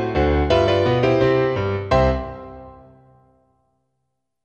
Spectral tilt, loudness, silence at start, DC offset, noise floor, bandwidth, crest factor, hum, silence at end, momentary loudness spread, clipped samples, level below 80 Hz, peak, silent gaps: -7.5 dB/octave; -18 LUFS; 0 s; under 0.1%; -76 dBFS; 8.4 kHz; 16 dB; none; 1.7 s; 14 LU; under 0.1%; -32 dBFS; -4 dBFS; none